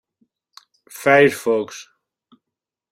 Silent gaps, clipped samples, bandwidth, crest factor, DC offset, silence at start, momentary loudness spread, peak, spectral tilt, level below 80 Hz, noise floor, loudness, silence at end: none; under 0.1%; 16 kHz; 20 dB; under 0.1%; 0.95 s; 24 LU; -2 dBFS; -4.5 dB/octave; -68 dBFS; -85 dBFS; -17 LUFS; 1.1 s